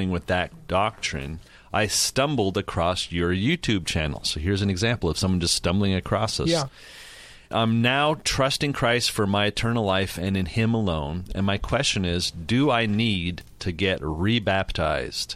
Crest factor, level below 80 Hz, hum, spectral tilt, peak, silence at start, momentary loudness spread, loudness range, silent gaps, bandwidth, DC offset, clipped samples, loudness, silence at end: 16 dB; -42 dBFS; none; -4.5 dB/octave; -8 dBFS; 0 s; 8 LU; 2 LU; none; 15 kHz; under 0.1%; under 0.1%; -24 LUFS; 0 s